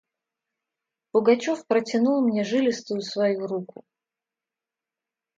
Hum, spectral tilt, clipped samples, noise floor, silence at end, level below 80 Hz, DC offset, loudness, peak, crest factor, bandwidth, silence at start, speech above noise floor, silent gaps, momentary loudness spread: none; -5.5 dB/octave; under 0.1%; -89 dBFS; 1.75 s; -76 dBFS; under 0.1%; -24 LUFS; -6 dBFS; 20 dB; 7.8 kHz; 1.15 s; 66 dB; none; 9 LU